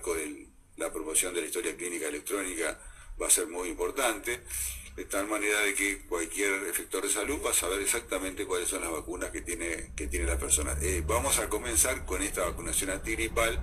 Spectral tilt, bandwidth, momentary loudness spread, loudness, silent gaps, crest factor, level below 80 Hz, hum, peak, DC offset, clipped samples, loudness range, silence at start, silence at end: -2.5 dB/octave; 15.5 kHz; 10 LU; -30 LUFS; none; 22 dB; -42 dBFS; none; -10 dBFS; under 0.1%; under 0.1%; 3 LU; 0 s; 0 s